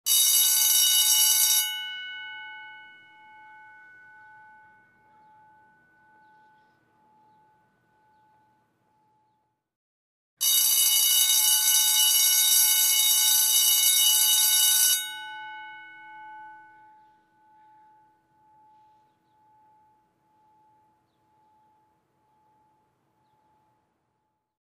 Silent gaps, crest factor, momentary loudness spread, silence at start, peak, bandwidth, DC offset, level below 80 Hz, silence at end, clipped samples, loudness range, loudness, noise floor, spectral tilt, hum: 9.76-10.37 s; 20 dB; 21 LU; 0.05 s; -6 dBFS; 15.5 kHz; under 0.1%; -90 dBFS; 8.1 s; under 0.1%; 14 LU; -18 LUFS; -77 dBFS; 6 dB/octave; none